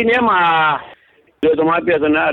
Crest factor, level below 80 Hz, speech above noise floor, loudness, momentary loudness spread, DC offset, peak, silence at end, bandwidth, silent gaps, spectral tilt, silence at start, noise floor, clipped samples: 10 dB; -50 dBFS; 32 dB; -15 LUFS; 6 LU; under 0.1%; -4 dBFS; 0 s; 5.4 kHz; none; -7 dB/octave; 0 s; -46 dBFS; under 0.1%